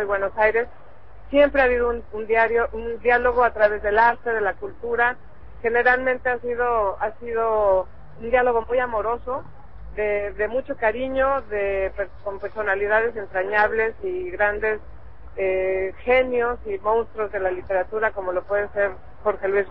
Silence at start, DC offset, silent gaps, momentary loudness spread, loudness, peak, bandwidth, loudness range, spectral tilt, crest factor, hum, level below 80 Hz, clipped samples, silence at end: 0 s; 1%; none; 10 LU; -22 LUFS; -6 dBFS; 5.6 kHz; 4 LU; -8 dB/octave; 16 dB; none; -44 dBFS; under 0.1%; 0 s